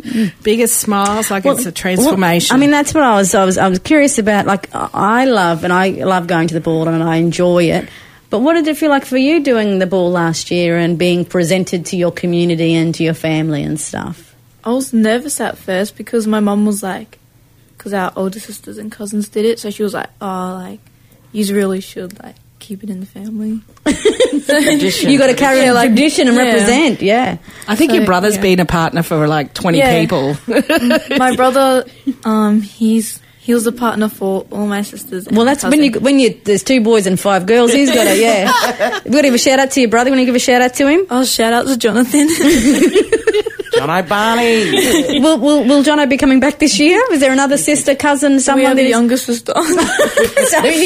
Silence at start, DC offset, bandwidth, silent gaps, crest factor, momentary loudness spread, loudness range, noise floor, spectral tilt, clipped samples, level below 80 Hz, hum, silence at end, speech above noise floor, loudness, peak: 0.05 s; under 0.1%; 16 kHz; none; 12 dB; 11 LU; 8 LU; -48 dBFS; -4.5 dB/octave; under 0.1%; -44 dBFS; none; 0 s; 35 dB; -13 LUFS; 0 dBFS